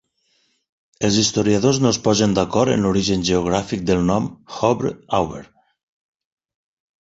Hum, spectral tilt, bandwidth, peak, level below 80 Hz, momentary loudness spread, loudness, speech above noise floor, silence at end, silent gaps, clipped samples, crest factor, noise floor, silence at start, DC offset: none; -5 dB/octave; 8 kHz; -2 dBFS; -44 dBFS; 6 LU; -19 LUFS; 47 dB; 1.55 s; none; under 0.1%; 18 dB; -65 dBFS; 1 s; under 0.1%